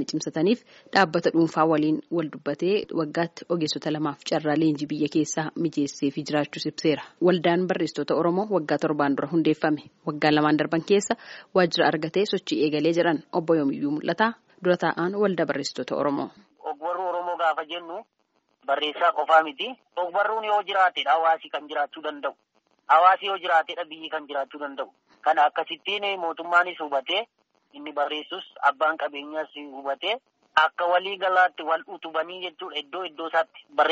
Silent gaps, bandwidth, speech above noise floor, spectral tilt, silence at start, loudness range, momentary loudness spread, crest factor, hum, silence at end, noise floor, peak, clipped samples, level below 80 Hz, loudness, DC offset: none; 8 kHz; 42 dB; -3 dB/octave; 0 s; 3 LU; 11 LU; 20 dB; none; 0 s; -67 dBFS; -4 dBFS; under 0.1%; -72 dBFS; -25 LUFS; under 0.1%